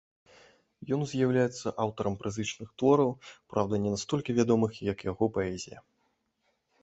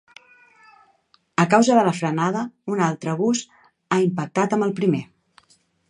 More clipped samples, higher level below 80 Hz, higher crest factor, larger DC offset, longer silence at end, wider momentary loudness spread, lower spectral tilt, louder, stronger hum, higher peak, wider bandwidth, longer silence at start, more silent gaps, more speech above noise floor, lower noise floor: neither; first, -58 dBFS vs -70 dBFS; about the same, 20 dB vs 22 dB; neither; first, 1 s vs 0.85 s; about the same, 10 LU vs 10 LU; about the same, -6 dB/octave vs -5.5 dB/octave; second, -30 LUFS vs -21 LUFS; neither; second, -10 dBFS vs -2 dBFS; second, 8.2 kHz vs 10.5 kHz; second, 0.8 s vs 1.4 s; neither; first, 47 dB vs 41 dB; first, -76 dBFS vs -61 dBFS